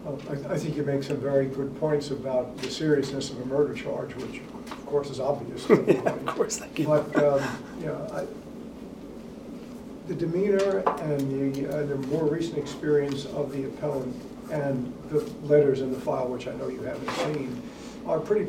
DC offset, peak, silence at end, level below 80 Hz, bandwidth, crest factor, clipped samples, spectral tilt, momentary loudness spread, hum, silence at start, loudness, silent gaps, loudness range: under 0.1%; -6 dBFS; 0 s; -56 dBFS; 16 kHz; 22 dB; under 0.1%; -6 dB/octave; 16 LU; none; 0 s; -28 LUFS; none; 4 LU